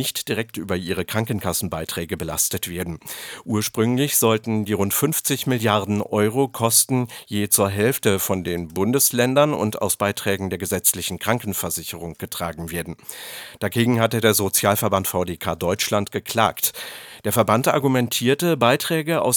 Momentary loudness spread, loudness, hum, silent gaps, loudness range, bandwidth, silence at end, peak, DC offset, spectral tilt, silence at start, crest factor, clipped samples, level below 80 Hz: 11 LU; -21 LUFS; none; none; 5 LU; over 20 kHz; 0 s; -2 dBFS; under 0.1%; -4 dB/octave; 0 s; 20 dB; under 0.1%; -52 dBFS